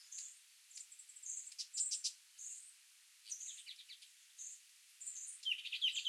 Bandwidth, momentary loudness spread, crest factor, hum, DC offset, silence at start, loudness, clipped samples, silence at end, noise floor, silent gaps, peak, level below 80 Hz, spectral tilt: 16 kHz; 20 LU; 22 dB; none; under 0.1%; 0 s; -44 LUFS; under 0.1%; 0 s; -66 dBFS; none; -26 dBFS; under -90 dBFS; 10.5 dB/octave